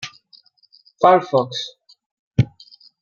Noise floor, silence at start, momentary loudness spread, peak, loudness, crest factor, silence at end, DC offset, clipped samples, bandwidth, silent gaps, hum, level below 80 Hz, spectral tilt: -55 dBFS; 0 s; 16 LU; -2 dBFS; -19 LUFS; 20 dB; 0.55 s; under 0.1%; under 0.1%; 7.2 kHz; 2.06-2.31 s; none; -50 dBFS; -6.5 dB/octave